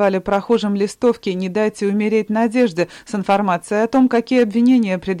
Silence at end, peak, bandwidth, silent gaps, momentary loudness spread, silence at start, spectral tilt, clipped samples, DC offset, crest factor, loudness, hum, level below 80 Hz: 0 s; -6 dBFS; 11.5 kHz; none; 6 LU; 0 s; -6.5 dB/octave; under 0.1%; under 0.1%; 12 dB; -17 LUFS; none; -52 dBFS